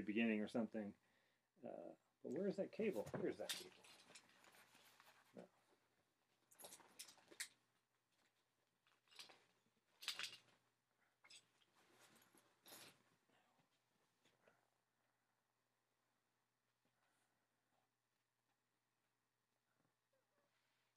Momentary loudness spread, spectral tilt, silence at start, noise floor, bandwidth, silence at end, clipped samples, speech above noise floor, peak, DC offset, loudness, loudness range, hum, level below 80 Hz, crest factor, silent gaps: 21 LU; -4 dB/octave; 0 s; under -90 dBFS; 15 kHz; 8.05 s; under 0.1%; over 43 dB; -28 dBFS; under 0.1%; -49 LUFS; 19 LU; none; under -90 dBFS; 26 dB; none